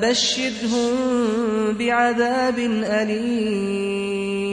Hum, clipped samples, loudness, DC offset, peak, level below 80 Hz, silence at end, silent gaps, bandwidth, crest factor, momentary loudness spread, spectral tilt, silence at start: none; under 0.1%; -21 LUFS; under 0.1%; -6 dBFS; -56 dBFS; 0 s; none; 10.5 kHz; 14 dB; 5 LU; -4 dB/octave; 0 s